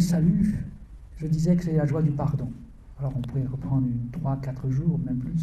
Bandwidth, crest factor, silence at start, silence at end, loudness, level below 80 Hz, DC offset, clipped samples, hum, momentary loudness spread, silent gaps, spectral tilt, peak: 13 kHz; 14 dB; 0 s; 0 s; -26 LUFS; -42 dBFS; under 0.1%; under 0.1%; none; 11 LU; none; -8.5 dB/octave; -10 dBFS